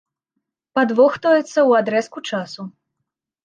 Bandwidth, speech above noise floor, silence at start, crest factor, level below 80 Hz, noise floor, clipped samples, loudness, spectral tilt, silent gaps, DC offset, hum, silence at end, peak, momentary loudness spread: 9.2 kHz; 62 dB; 0.75 s; 16 dB; -70 dBFS; -79 dBFS; under 0.1%; -18 LUFS; -5 dB/octave; none; under 0.1%; none; 0.75 s; -2 dBFS; 16 LU